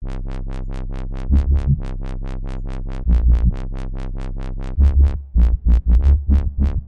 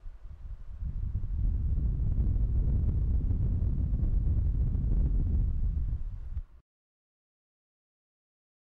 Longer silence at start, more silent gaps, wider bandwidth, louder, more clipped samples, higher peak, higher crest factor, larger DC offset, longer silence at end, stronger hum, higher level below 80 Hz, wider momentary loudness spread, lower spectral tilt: about the same, 0 s vs 0.05 s; neither; first, 4.1 kHz vs 1.7 kHz; first, -21 LUFS vs -32 LUFS; neither; first, -4 dBFS vs -20 dBFS; about the same, 12 dB vs 10 dB; neither; second, 0 s vs 2.2 s; neither; first, -18 dBFS vs -30 dBFS; about the same, 14 LU vs 12 LU; second, -9.5 dB/octave vs -12 dB/octave